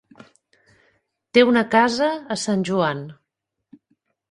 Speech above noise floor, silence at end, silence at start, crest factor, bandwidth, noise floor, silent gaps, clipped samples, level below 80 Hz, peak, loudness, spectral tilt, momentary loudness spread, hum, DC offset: 61 dB; 1.15 s; 1.35 s; 20 dB; 11.5 kHz; -80 dBFS; none; under 0.1%; -64 dBFS; -2 dBFS; -19 LUFS; -5 dB/octave; 10 LU; none; under 0.1%